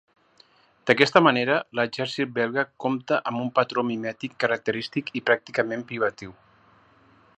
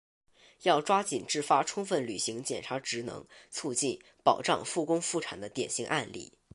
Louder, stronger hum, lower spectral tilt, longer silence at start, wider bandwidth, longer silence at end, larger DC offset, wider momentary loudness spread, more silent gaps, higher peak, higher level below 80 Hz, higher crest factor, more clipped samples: first, -24 LUFS vs -31 LUFS; neither; first, -5.5 dB/octave vs -3 dB/octave; first, 0.85 s vs 0.6 s; second, 9.2 kHz vs 11.5 kHz; first, 1.05 s vs 0.3 s; neither; about the same, 11 LU vs 11 LU; neither; first, 0 dBFS vs -8 dBFS; about the same, -70 dBFS vs -70 dBFS; about the same, 24 dB vs 22 dB; neither